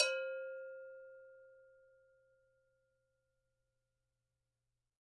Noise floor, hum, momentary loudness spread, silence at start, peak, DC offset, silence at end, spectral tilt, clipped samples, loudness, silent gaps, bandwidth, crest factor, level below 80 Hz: -89 dBFS; none; 23 LU; 0 s; -18 dBFS; under 0.1%; 3.3 s; 4.5 dB/octave; under 0.1%; -43 LUFS; none; 5.6 kHz; 30 dB; under -90 dBFS